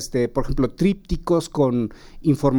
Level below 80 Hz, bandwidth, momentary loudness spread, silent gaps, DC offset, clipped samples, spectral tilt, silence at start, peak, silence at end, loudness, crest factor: -34 dBFS; 18 kHz; 5 LU; none; under 0.1%; under 0.1%; -7 dB/octave; 0 s; -6 dBFS; 0 s; -22 LUFS; 14 dB